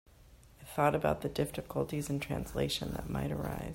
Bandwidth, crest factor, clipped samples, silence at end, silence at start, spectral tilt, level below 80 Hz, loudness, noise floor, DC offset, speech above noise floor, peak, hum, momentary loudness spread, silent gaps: 16 kHz; 20 dB; under 0.1%; 0 s; 0.2 s; -5.5 dB/octave; -50 dBFS; -35 LUFS; -58 dBFS; under 0.1%; 24 dB; -16 dBFS; none; 7 LU; none